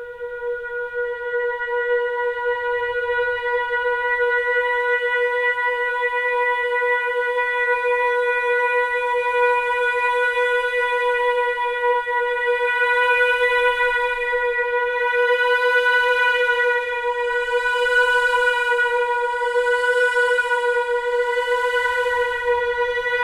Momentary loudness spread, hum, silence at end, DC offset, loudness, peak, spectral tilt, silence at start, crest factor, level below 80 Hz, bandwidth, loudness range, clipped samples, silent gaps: 6 LU; none; 0 s; under 0.1%; -19 LUFS; -8 dBFS; 0 dB/octave; 0 s; 12 dB; -52 dBFS; 12.5 kHz; 3 LU; under 0.1%; none